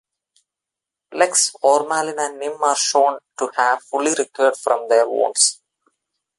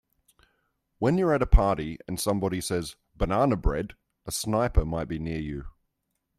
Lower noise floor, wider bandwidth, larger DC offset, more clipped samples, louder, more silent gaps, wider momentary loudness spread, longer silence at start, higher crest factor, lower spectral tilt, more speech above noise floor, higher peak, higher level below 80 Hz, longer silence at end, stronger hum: first, -86 dBFS vs -79 dBFS; second, 11.5 kHz vs 14.5 kHz; neither; neither; first, -18 LUFS vs -27 LUFS; neither; second, 8 LU vs 11 LU; about the same, 1.1 s vs 1 s; about the same, 18 dB vs 22 dB; second, 0 dB/octave vs -6 dB/octave; first, 68 dB vs 54 dB; about the same, -2 dBFS vs -4 dBFS; second, -76 dBFS vs -32 dBFS; first, 0.85 s vs 0.7 s; neither